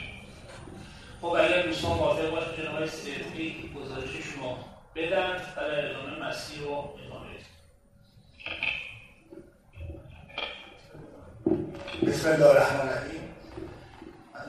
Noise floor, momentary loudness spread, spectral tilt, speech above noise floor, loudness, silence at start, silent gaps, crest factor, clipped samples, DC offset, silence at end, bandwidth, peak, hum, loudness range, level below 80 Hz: -59 dBFS; 23 LU; -5 dB/octave; 30 dB; -29 LUFS; 0 s; none; 24 dB; under 0.1%; under 0.1%; 0 s; 13 kHz; -6 dBFS; none; 11 LU; -54 dBFS